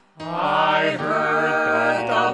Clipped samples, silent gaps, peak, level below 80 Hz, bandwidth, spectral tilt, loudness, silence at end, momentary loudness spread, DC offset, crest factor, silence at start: under 0.1%; none; -6 dBFS; -64 dBFS; 11 kHz; -5 dB/octave; -20 LUFS; 0 s; 4 LU; under 0.1%; 14 dB; 0.2 s